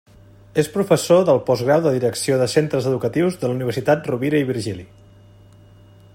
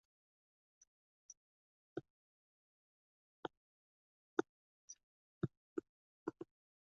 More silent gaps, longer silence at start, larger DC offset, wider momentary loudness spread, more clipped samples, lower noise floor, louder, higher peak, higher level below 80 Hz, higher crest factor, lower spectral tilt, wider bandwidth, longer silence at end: second, none vs 1.37-1.96 s, 2.10-3.43 s, 3.57-4.37 s, 4.49-4.88 s, 5.03-5.41 s, 5.57-5.76 s, 5.89-6.26 s; second, 0.55 s vs 1.3 s; neither; second, 8 LU vs 19 LU; neither; second, -47 dBFS vs under -90 dBFS; first, -19 LUFS vs -49 LUFS; first, -2 dBFS vs -20 dBFS; first, -56 dBFS vs -82 dBFS; second, 18 dB vs 32 dB; about the same, -6 dB/octave vs -6.5 dB/octave; first, 16.5 kHz vs 7 kHz; first, 1.3 s vs 0.45 s